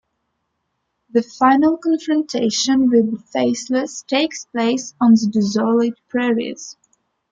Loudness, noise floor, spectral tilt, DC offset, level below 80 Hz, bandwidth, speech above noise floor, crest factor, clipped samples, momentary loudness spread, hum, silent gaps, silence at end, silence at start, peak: -18 LUFS; -73 dBFS; -4.5 dB/octave; under 0.1%; -62 dBFS; 7.8 kHz; 56 dB; 16 dB; under 0.1%; 8 LU; none; none; 0.6 s; 1.15 s; -2 dBFS